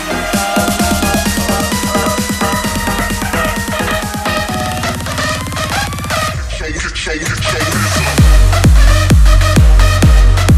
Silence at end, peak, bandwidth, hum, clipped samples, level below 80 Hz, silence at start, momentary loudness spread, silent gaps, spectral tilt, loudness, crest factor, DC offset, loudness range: 0 s; 0 dBFS; 15.5 kHz; none; under 0.1%; -14 dBFS; 0 s; 8 LU; none; -4.5 dB/octave; -13 LUFS; 12 dB; under 0.1%; 6 LU